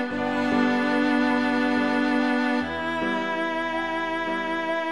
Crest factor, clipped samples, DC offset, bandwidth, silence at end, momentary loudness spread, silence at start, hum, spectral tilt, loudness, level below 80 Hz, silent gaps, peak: 14 dB; under 0.1%; 0.3%; 11 kHz; 0 s; 5 LU; 0 s; none; -5 dB/octave; -24 LUFS; -58 dBFS; none; -10 dBFS